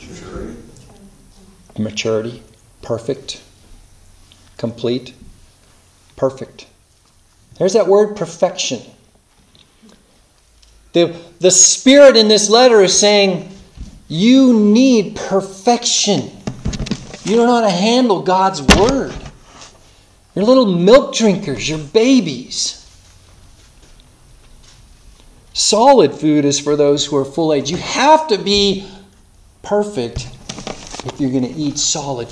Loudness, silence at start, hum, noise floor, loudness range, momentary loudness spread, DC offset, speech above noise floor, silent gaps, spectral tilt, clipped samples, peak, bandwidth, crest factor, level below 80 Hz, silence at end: -13 LUFS; 0 s; none; -52 dBFS; 16 LU; 19 LU; under 0.1%; 39 dB; none; -3.5 dB/octave; 0.1%; 0 dBFS; 11 kHz; 16 dB; -38 dBFS; 0.05 s